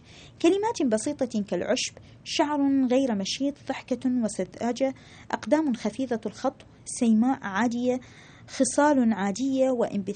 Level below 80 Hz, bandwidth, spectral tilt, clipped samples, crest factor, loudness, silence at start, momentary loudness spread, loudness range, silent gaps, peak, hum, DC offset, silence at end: -62 dBFS; 9.4 kHz; -4.5 dB/octave; under 0.1%; 18 dB; -26 LUFS; 0.15 s; 10 LU; 3 LU; none; -8 dBFS; none; under 0.1%; 0 s